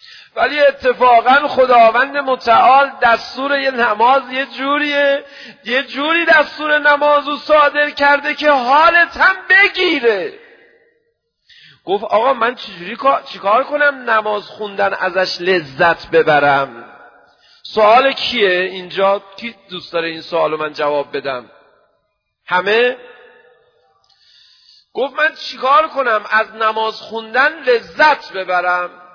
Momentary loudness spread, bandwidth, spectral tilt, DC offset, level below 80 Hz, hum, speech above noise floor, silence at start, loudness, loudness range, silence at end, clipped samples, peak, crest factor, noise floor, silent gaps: 11 LU; 5.4 kHz; -4.5 dB/octave; under 0.1%; -56 dBFS; none; 54 dB; 0.35 s; -14 LUFS; 8 LU; 0.25 s; under 0.1%; 0 dBFS; 14 dB; -68 dBFS; none